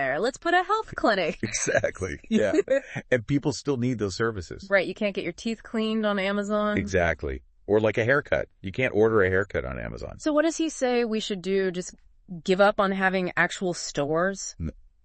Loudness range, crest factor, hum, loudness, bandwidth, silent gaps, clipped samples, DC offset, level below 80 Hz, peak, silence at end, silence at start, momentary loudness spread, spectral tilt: 2 LU; 18 dB; none; -26 LUFS; 8.8 kHz; none; under 0.1%; under 0.1%; -48 dBFS; -6 dBFS; 0.35 s; 0 s; 11 LU; -5 dB/octave